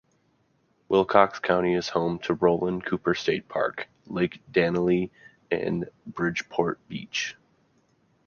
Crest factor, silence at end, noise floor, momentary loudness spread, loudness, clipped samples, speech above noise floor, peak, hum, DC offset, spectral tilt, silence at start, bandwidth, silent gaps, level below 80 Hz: 24 dB; 0.95 s; -68 dBFS; 11 LU; -26 LUFS; under 0.1%; 42 dB; -2 dBFS; none; under 0.1%; -5.5 dB/octave; 0.9 s; 7 kHz; none; -58 dBFS